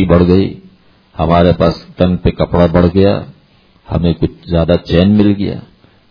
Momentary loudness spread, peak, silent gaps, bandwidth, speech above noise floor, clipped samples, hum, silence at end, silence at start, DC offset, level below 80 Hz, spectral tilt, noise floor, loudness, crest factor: 11 LU; 0 dBFS; none; 5.4 kHz; 37 dB; 0.3%; none; 0.5 s; 0 s; under 0.1%; -28 dBFS; -9.5 dB/octave; -48 dBFS; -12 LUFS; 12 dB